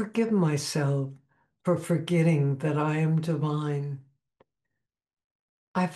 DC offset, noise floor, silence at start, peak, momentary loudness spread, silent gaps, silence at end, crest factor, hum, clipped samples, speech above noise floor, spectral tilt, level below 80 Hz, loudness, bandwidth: under 0.1%; -85 dBFS; 0 s; -12 dBFS; 10 LU; 5.24-5.74 s; 0 s; 14 dB; none; under 0.1%; 59 dB; -7 dB/octave; -72 dBFS; -27 LUFS; 12.5 kHz